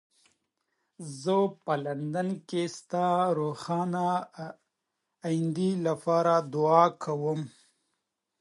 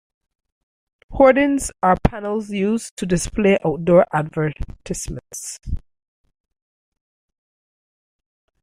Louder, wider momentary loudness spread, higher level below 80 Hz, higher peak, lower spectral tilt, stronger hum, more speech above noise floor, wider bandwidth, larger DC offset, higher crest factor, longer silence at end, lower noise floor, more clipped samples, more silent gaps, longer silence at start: second, -28 LUFS vs -19 LUFS; about the same, 14 LU vs 16 LU; second, -78 dBFS vs -36 dBFS; second, -8 dBFS vs -2 dBFS; about the same, -6.5 dB/octave vs -5.5 dB/octave; neither; second, 55 dB vs over 71 dB; second, 11.5 kHz vs 15.5 kHz; neither; about the same, 22 dB vs 20 dB; second, 0.9 s vs 2.85 s; second, -83 dBFS vs under -90 dBFS; neither; second, none vs 2.91-2.97 s; about the same, 1 s vs 1.1 s